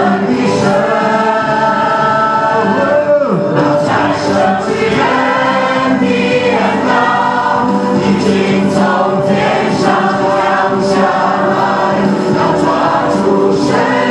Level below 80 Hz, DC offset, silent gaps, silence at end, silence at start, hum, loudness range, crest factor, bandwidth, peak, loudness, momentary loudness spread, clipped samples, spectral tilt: -46 dBFS; under 0.1%; none; 0 s; 0 s; none; 0 LU; 12 dB; 11.5 kHz; 0 dBFS; -11 LUFS; 1 LU; under 0.1%; -6 dB/octave